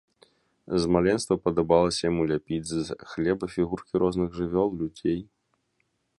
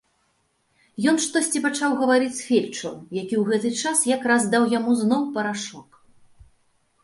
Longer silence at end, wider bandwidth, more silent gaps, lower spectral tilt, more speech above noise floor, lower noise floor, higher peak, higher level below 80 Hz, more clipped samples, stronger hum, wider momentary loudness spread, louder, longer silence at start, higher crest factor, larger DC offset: second, 0.95 s vs 1.2 s; about the same, 11.5 kHz vs 11.5 kHz; neither; first, -6 dB/octave vs -3.5 dB/octave; about the same, 48 dB vs 46 dB; first, -74 dBFS vs -68 dBFS; about the same, -6 dBFS vs -6 dBFS; first, -50 dBFS vs -66 dBFS; neither; neither; second, 8 LU vs 11 LU; second, -26 LUFS vs -22 LUFS; second, 0.7 s vs 1 s; about the same, 20 dB vs 18 dB; neither